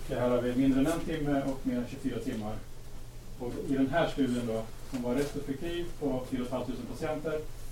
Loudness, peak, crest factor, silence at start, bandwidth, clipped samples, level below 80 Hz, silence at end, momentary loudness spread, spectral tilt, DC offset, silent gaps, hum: -32 LUFS; -16 dBFS; 16 dB; 0 s; 16.5 kHz; under 0.1%; -42 dBFS; 0 s; 13 LU; -6.5 dB/octave; under 0.1%; none; none